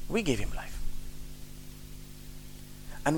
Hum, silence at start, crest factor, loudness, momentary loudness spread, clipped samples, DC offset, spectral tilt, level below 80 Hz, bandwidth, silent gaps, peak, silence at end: 50 Hz at -50 dBFS; 0 s; 22 dB; -38 LUFS; 17 LU; under 0.1%; 0.3%; -5 dB/octave; -40 dBFS; 18.5 kHz; none; -12 dBFS; 0 s